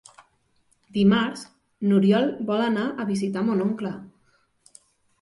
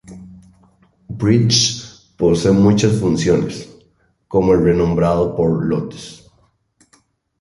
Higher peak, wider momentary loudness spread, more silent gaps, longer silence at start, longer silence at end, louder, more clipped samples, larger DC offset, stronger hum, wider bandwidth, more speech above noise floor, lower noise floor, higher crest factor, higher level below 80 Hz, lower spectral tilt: second, -8 dBFS vs -2 dBFS; second, 12 LU vs 17 LU; neither; first, 0.95 s vs 0.1 s; about the same, 1.15 s vs 1.25 s; second, -23 LUFS vs -16 LUFS; neither; neither; neither; about the same, 11.5 kHz vs 11.5 kHz; about the same, 44 dB vs 44 dB; first, -66 dBFS vs -59 dBFS; about the same, 18 dB vs 16 dB; second, -64 dBFS vs -40 dBFS; first, -7 dB/octave vs -5.5 dB/octave